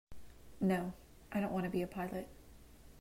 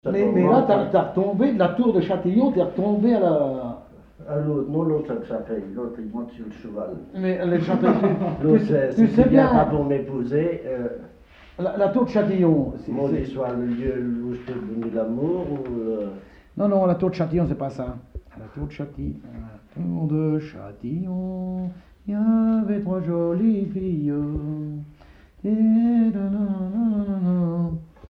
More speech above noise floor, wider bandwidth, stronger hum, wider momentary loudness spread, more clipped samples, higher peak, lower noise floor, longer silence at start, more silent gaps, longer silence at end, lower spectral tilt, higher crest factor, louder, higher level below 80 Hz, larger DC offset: second, 21 dB vs 27 dB; first, 16 kHz vs 5.8 kHz; neither; first, 21 LU vs 15 LU; neither; second, -24 dBFS vs -2 dBFS; first, -58 dBFS vs -49 dBFS; about the same, 0.1 s vs 0.05 s; neither; about the same, 0 s vs 0.05 s; second, -7.5 dB/octave vs -10 dB/octave; about the same, 16 dB vs 20 dB; second, -39 LUFS vs -22 LUFS; second, -60 dBFS vs -46 dBFS; neither